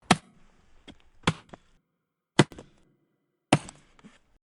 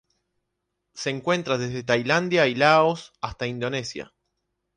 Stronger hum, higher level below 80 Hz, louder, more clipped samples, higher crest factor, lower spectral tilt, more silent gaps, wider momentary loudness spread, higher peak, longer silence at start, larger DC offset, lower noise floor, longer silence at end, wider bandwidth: neither; about the same, -58 dBFS vs -58 dBFS; second, -27 LUFS vs -23 LUFS; neither; first, 26 dB vs 20 dB; about the same, -4.5 dB/octave vs -5 dB/octave; neither; first, 21 LU vs 14 LU; about the same, -6 dBFS vs -4 dBFS; second, 0.1 s vs 0.95 s; neither; about the same, -82 dBFS vs -79 dBFS; about the same, 0.8 s vs 0.7 s; first, 11.5 kHz vs 10 kHz